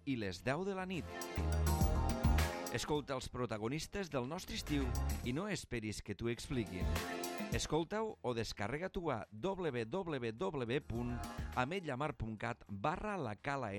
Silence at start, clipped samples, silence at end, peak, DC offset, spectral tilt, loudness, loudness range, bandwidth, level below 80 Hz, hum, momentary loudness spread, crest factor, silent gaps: 0.05 s; under 0.1%; 0 s; -22 dBFS; under 0.1%; -5.5 dB/octave; -40 LUFS; 3 LU; 17 kHz; -46 dBFS; none; 7 LU; 18 dB; none